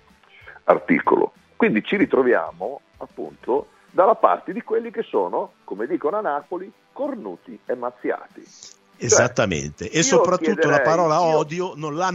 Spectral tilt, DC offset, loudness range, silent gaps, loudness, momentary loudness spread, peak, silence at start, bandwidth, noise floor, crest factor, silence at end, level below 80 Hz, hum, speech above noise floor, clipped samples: -4 dB/octave; under 0.1%; 8 LU; none; -21 LUFS; 16 LU; 0 dBFS; 0.45 s; 8.2 kHz; -48 dBFS; 22 dB; 0 s; -58 dBFS; none; 27 dB; under 0.1%